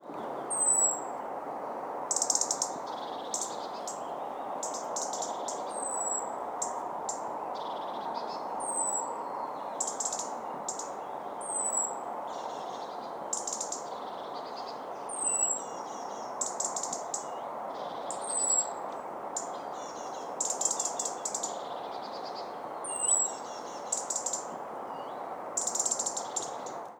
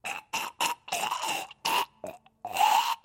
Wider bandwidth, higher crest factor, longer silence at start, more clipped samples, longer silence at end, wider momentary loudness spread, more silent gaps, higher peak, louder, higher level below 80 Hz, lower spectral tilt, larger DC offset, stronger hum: first, over 20 kHz vs 17 kHz; about the same, 24 dB vs 20 dB; about the same, 0 s vs 0.05 s; neither; about the same, 0 s vs 0.05 s; second, 12 LU vs 16 LU; neither; about the same, -12 dBFS vs -10 dBFS; second, -33 LUFS vs -29 LUFS; about the same, -78 dBFS vs -74 dBFS; about the same, -0.5 dB/octave vs 0 dB/octave; neither; neither